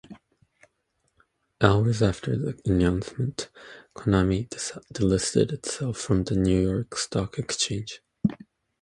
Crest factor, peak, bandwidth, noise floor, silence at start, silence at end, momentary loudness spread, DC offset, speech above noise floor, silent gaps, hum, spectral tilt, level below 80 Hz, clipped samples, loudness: 24 dB; -2 dBFS; 11.5 kHz; -74 dBFS; 0.1 s; 0.45 s; 11 LU; under 0.1%; 49 dB; none; none; -5.5 dB/octave; -42 dBFS; under 0.1%; -26 LUFS